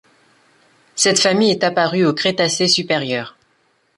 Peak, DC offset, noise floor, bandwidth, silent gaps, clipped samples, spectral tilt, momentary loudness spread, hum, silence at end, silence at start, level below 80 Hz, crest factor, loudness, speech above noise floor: -2 dBFS; under 0.1%; -61 dBFS; 11.5 kHz; none; under 0.1%; -3 dB/octave; 10 LU; none; 0.65 s; 0.95 s; -62 dBFS; 16 dB; -16 LUFS; 45 dB